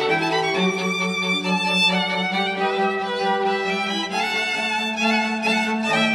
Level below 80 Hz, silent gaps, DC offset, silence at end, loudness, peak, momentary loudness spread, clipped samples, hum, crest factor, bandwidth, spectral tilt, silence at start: -66 dBFS; none; under 0.1%; 0 s; -21 LUFS; -8 dBFS; 4 LU; under 0.1%; none; 14 dB; 14 kHz; -4 dB/octave; 0 s